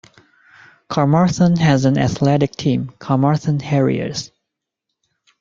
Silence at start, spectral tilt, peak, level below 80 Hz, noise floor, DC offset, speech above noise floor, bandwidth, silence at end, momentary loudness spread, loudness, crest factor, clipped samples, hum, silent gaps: 0.9 s; -7 dB/octave; -2 dBFS; -48 dBFS; -80 dBFS; under 0.1%; 64 dB; 7.6 kHz; 1.15 s; 9 LU; -17 LUFS; 16 dB; under 0.1%; none; none